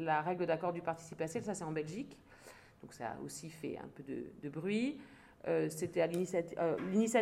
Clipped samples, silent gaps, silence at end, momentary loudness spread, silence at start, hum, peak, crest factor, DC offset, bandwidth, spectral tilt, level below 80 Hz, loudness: under 0.1%; none; 0 s; 17 LU; 0 s; none; -18 dBFS; 20 dB; under 0.1%; 16 kHz; -5.5 dB/octave; -72 dBFS; -38 LUFS